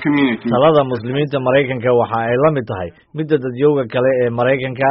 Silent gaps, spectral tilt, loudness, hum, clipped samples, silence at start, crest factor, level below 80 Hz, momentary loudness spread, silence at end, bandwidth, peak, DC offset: none; -5.5 dB/octave; -16 LUFS; none; under 0.1%; 0 s; 14 dB; -52 dBFS; 7 LU; 0 s; 5.6 kHz; -2 dBFS; under 0.1%